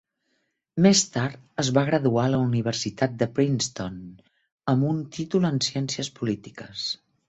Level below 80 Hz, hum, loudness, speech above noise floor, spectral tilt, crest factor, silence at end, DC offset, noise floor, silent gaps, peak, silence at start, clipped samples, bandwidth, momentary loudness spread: -60 dBFS; none; -25 LUFS; 50 dB; -5 dB/octave; 18 dB; 0.35 s; under 0.1%; -74 dBFS; 4.52-4.58 s; -6 dBFS; 0.75 s; under 0.1%; 8.2 kHz; 12 LU